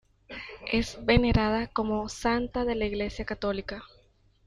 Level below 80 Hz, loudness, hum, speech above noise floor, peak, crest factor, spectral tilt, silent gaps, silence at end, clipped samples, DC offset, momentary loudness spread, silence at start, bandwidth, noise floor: -40 dBFS; -28 LUFS; none; 35 dB; -8 dBFS; 20 dB; -6 dB/octave; none; 0.6 s; under 0.1%; under 0.1%; 17 LU; 0.3 s; 11.5 kHz; -62 dBFS